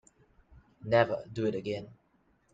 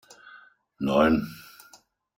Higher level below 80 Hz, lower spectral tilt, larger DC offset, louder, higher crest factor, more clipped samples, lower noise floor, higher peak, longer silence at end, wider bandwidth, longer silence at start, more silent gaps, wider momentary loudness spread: second, -64 dBFS vs -54 dBFS; about the same, -7 dB/octave vs -6.5 dB/octave; neither; second, -31 LUFS vs -24 LUFS; about the same, 22 dB vs 20 dB; neither; first, -70 dBFS vs -58 dBFS; second, -12 dBFS vs -8 dBFS; second, 0.6 s vs 0.75 s; second, 7.8 kHz vs 16.5 kHz; about the same, 0.8 s vs 0.8 s; neither; second, 18 LU vs 24 LU